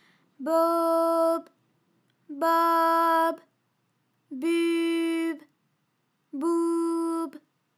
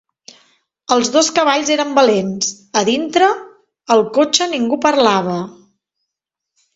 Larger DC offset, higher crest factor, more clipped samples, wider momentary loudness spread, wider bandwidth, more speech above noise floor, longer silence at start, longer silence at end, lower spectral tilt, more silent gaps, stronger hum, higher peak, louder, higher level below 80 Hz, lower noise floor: neither; about the same, 16 dB vs 16 dB; neither; first, 15 LU vs 8 LU; first, 15 kHz vs 8 kHz; second, 51 dB vs 67 dB; second, 0.4 s vs 0.9 s; second, 0.45 s vs 1.25 s; about the same, -3 dB/octave vs -3 dB/octave; neither; neither; second, -12 dBFS vs 0 dBFS; second, -25 LUFS vs -15 LUFS; second, under -90 dBFS vs -60 dBFS; second, -74 dBFS vs -82 dBFS